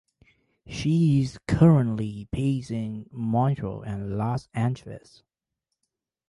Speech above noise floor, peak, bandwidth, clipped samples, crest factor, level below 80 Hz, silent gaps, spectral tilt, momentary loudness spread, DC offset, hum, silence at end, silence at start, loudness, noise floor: 59 dB; -6 dBFS; 11 kHz; under 0.1%; 20 dB; -48 dBFS; none; -8 dB/octave; 15 LU; under 0.1%; none; 1.3 s; 0.65 s; -25 LUFS; -84 dBFS